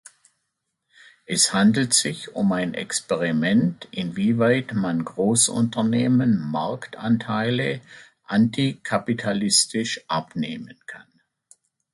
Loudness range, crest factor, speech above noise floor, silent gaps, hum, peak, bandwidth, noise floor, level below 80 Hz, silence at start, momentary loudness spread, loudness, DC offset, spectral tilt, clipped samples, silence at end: 3 LU; 20 dB; 56 dB; none; none; -4 dBFS; 11.5 kHz; -78 dBFS; -62 dBFS; 1.3 s; 11 LU; -22 LUFS; under 0.1%; -4 dB/octave; under 0.1%; 0.95 s